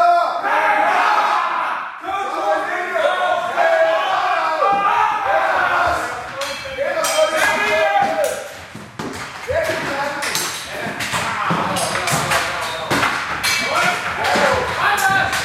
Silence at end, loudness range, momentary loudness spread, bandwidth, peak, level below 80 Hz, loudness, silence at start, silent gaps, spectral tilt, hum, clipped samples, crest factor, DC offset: 0 s; 4 LU; 10 LU; 16 kHz; -2 dBFS; -50 dBFS; -18 LUFS; 0 s; none; -2.5 dB/octave; none; under 0.1%; 16 dB; under 0.1%